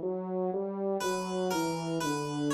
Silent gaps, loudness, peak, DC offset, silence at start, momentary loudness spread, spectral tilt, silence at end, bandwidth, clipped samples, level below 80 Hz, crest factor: none; -32 LUFS; -20 dBFS; under 0.1%; 0 s; 2 LU; -5 dB/octave; 0 s; 14 kHz; under 0.1%; -68 dBFS; 12 dB